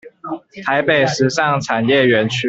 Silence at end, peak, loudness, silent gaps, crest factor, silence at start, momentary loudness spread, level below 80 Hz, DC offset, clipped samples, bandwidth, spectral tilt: 0 s; -2 dBFS; -15 LUFS; none; 16 dB; 0.05 s; 16 LU; -56 dBFS; under 0.1%; under 0.1%; 8.2 kHz; -5 dB/octave